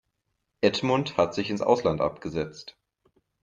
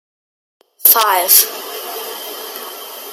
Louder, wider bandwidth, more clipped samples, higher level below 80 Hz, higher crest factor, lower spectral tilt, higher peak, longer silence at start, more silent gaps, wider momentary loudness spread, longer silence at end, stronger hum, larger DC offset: second, -26 LUFS vs -10 LUFS; second, 7.6 kHz vs over 20 kHz; second, under 0.1% vs 0.2%; first, -58 dBFS vs -72 dBFS; about the same, 22 dB vs 18 dB; first, -5.5 dB/octave vs 2 dB/octave; second, -6 dBFS vs 0 dBFS; second, 0.6 s vs 0.8 s; neither; second, 12 LU vs 18 LU; first, 0.75 s vs 0 s; neither; neither